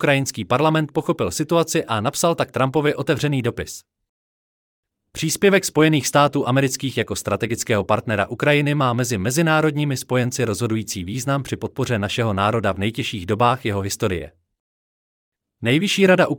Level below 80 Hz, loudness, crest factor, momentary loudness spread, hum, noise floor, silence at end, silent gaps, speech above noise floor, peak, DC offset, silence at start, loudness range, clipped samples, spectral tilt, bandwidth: -54 dBFS; -20 LUFS; 16 dB; 8 LU; none; under -90 dBFS; 0 s; 4.09-4.83 s, 14.60-15.32 s; over 70 dB; -4 dBFS; under 0.1%; 0 s; 4 LU; under 0.1%; -5 dB/octave; 19 kHz